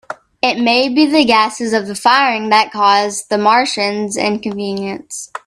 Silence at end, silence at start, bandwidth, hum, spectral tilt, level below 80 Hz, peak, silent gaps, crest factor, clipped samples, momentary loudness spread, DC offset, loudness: 0.1 s; 0.1 s; 13.5 kHz; none; -3 dB/octave; -58 dBFS; 0 dBFS; none; 14 dB; under 0.1%; 10 LU; under 0.1%; -14 LUFS